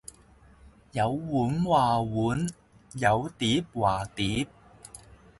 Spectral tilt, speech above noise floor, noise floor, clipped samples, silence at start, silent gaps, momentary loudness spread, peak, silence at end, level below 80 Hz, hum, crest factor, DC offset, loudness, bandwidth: -5.5 dB/octave; 29 dB; -56 dBFS; under 0.1%; 0.65 s; none; 22 LU; -8 dBFS; 0.4 s; -52 dBFS; none; 20 dB; under 0.1%; -27 LUFS; 11.5 kHz